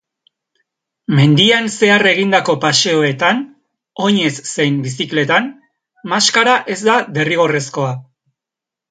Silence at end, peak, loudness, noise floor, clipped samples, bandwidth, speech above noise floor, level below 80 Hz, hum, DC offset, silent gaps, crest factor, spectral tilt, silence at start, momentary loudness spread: 0.9 s; 0 dBFS; -14 LUFS; -85 dBFS; under 0.1%; 9.4 kHz; 71 dB; -60 dBFS; none; under 0.1%; none; 16 dB; -4 dB/octave; 1.1 s; 11 LU